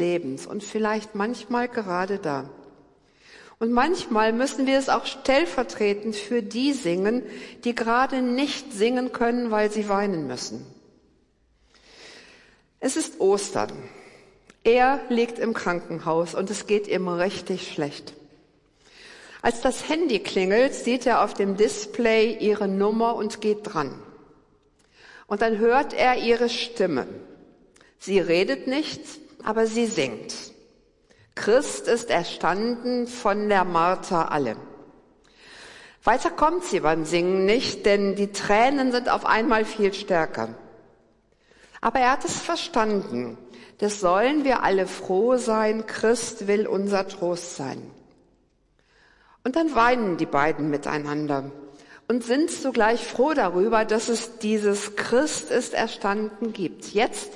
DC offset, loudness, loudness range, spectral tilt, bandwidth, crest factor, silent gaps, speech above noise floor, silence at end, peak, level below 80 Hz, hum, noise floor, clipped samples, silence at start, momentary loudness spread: under 0.1%; -24 LUFS; 6 LU; -4 dB/octave; 11.5 kHz; 18 dB; none; 41 dB; 0 s; -6 dBFS; -54 dBFS; none; -64 dBFS; under 0.1%; 0 s; 11 LU